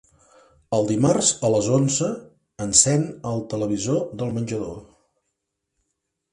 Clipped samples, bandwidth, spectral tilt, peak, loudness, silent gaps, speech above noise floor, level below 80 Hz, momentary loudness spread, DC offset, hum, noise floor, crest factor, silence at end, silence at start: under 0.1%; 11.5 kHz; -4.5 dB/octave; 0 dBFS; -21 LUFS; none; 57 dB; -54 dBFS; 14 LU; under 0.1%; none; -79 dBFS; 24 dB; 1.5 s; 0.7 s